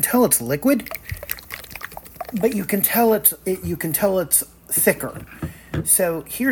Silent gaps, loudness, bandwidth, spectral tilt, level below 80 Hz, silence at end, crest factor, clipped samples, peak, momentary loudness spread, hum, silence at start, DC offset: none; -19 LUFS; 19 kHz; -4 dB/octave; -46 dBFS; 0 s; 20 dB; under 0.1%; 0 dBFS; 17 LU; none; 0 s; under 0.1%